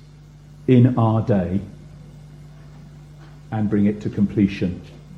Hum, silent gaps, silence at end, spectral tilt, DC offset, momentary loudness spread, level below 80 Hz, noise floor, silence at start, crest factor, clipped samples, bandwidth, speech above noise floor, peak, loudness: none; none; 0 s; -9.5 dB/octave; under 0.1%; 15 LU; -48 dBFS; -44 dBFS; 0.6 s; 18 dB; under 0.1%; 6.8 kHz; 26 dB; -2 dBFS; -20 LUFS